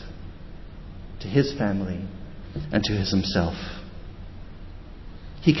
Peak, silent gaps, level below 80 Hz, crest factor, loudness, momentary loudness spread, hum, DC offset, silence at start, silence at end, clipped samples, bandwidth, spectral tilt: -4 dBFS; none; -40 dBFS; 22 dB; -26 LUFS; 21 LU; none; under 0.1%; 0 s; 0 s; under 0.1%; 6.2 kHz; -6.5 dB/octave